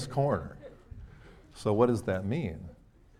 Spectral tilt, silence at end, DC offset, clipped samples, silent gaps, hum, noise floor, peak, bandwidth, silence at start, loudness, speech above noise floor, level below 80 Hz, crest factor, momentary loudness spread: -7.5 dB/octave; 0.45 s; under 0.1%; under 0.1%; none; none; -53 dBFS; -12 dBFS; 13.5 kHz; 0 s; -30 LUFS; 23 dB; -54 dBFS; 20 dB; 24 LU